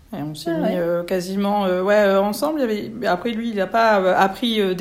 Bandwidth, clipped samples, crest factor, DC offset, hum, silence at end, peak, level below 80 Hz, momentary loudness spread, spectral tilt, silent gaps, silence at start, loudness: 16 kHz; under 0.1%; 16 dB; under 0.1%; none; 0 s; -4 dBFS; -54 dBFS; 8 LU; -5.5 dB/octave; none; 0.1 s; -20 LUFS